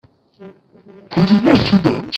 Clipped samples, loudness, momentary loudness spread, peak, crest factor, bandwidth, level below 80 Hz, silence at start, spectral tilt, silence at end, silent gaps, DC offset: under 0.1%; -14 LUFS; 7 LU; 0 dBFS; 16 dB; 7.8 kHz; -44 dBFS; 0.4 s; -7.5 dB/octave; 0 s; none; under 0.1%